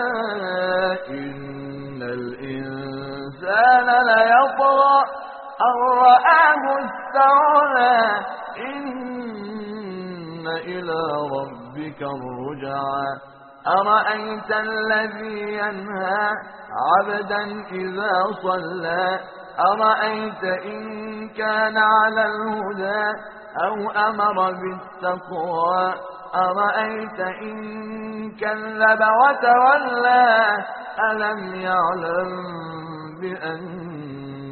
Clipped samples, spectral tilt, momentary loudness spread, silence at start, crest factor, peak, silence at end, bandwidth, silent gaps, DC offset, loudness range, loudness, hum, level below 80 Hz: under 0.1%; -2 dB/octave; 17 LU; 0 s; 18 dB; -2 dBFS; 0 s; 4.5 kHz; none; under 0.1%; 11 LU; -20 LUFS; none; -64 dBFS